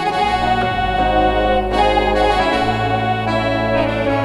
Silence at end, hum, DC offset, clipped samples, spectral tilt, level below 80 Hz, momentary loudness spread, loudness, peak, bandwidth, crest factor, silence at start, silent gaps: 0 s; none; under 0.1%; under 0.1%; -6 dB/octave; -28 dBFS; 3 LU; -16 LUFS; -2 dBFS; 12 kHz; 14 dB; 0 s; none